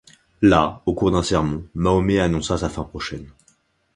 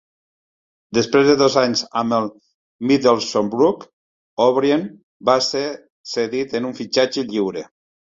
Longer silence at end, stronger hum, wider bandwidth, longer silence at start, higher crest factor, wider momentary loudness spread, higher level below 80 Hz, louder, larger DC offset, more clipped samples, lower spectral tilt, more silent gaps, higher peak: first, 0.7 s vs 0.45 s; neither; first, 11 kHz vs 7.8 kHz; second, 0.4 s vs 0.9 s; about the same, 20 dB vs 18 dB; about the same, 13 LU vs 13 LU; first, -36 dBFS vs -60 dBFS; about the same, -20 LUFS vs -19 LUFS; neither; neither; first, -6 dB/octave vs -4.5 dB/octave; second, none vs 2.54-2.79 s, 3.93-4.37 s, 5.03-5.20 s, 5.90-6.04 s; about the same, 0 dBFS vs -2 dBFS